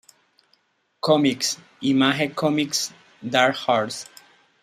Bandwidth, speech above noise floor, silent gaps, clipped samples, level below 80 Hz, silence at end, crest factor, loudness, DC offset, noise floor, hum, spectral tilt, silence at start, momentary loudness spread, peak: 15.5 kHz; 44 dB; none; under 0.1%; -68 dBFS; 0.6 s; 22 dB; -22 LUFS; under 0.1%; -66 dBFS; none; -3.5 dB/octave; 1.05 s; 11 LU; -2 dBFS